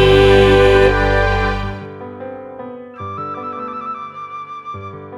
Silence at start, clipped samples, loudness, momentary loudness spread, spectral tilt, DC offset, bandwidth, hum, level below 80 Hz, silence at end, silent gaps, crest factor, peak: 0 s; under 0.1%; -14 LUFS; 21 LU; -6.5 dB/octave; under 0.1%; 11 kHz; none; -26 dBFS; 0 s; none; 16 dB; 0 dBFS